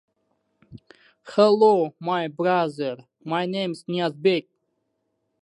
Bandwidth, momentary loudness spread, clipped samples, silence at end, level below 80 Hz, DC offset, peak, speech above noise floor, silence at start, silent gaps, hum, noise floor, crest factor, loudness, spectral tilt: 11 kHz; 11 LU; under 0.1%; 1 s; -72 dBFS; under 0.1%; -4 dBFS; 53 dB; 0.7 s; none; none; -75 dBFS; 20 dB; -23 LUFS; -6.5 dB/octave